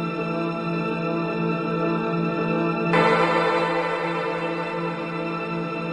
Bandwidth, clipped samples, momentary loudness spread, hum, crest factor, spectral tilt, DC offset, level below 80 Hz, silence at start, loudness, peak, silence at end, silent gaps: 10 kHz; under 0.1%; 8 LU; none; 18 dB; -7 dB/octave; under 0.1%; -60 dBFS; 0 s; -24 LUFS; -6 dBFS; 0 s; none